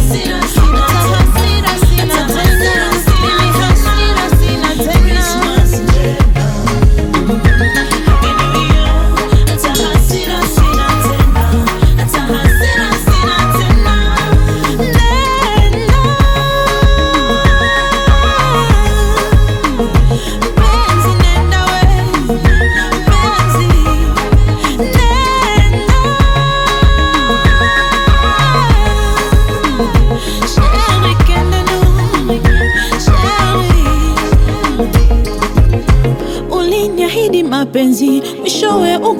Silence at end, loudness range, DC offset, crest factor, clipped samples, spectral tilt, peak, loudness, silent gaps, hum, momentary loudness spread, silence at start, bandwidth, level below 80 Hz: 0 s; 1 LU; under 0.1%; 10 dB; under 0.1%; -5 dB/octave; 0 dBFS; -11 LUFS; none; none; 3 LU; 0 s; 17.5 kHz; -12 dBFS